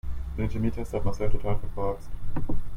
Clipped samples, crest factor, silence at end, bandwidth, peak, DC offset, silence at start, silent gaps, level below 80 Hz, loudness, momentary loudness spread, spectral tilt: under 0.1%; 14 dB; 0 s; 6.8 kHz; -10 dBFS; under 0.1%; 0.05 s; none; -32 dBFS; -32 LUFS; 7 LU; -8.5 dB/octave